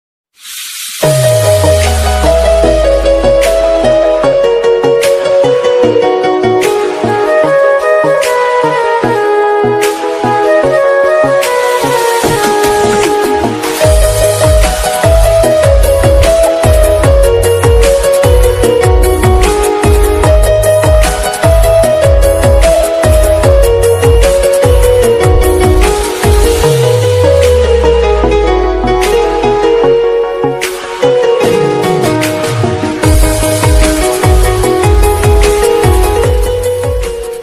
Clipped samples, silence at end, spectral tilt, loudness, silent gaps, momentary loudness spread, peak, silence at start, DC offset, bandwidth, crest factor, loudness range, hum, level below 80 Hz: 1%; 0 s; -5 dB/octave; -9 LUFS; none; 4 LU; 0 dBFS; 0.45 s; under 0.1%; 15.5 kHz; 8 dB; 2 LU; none; -14 dBFS